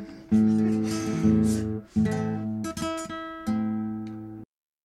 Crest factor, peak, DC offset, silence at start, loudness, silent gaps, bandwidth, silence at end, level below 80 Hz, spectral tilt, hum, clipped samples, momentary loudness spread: 16 dB; -10 dBFS; under 0.1%; 0 s; -27 LUFS; none; 13 kHz; 0.4 s; -50 dBFS; -6.5 dB/octave; none; under 0.1%; 13 LU